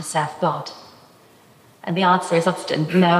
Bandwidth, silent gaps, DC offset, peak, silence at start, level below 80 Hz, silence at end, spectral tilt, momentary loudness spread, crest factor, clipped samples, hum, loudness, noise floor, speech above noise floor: 14.5 kHz; none; under 0.1%; -4 dBFS; 0 s; -68 dBFS; 0 s; -5.5 dB/octave; 17 LU; 18 dB; under 0.1%; none; -20 LUFS; -51 dBFS; 32 dB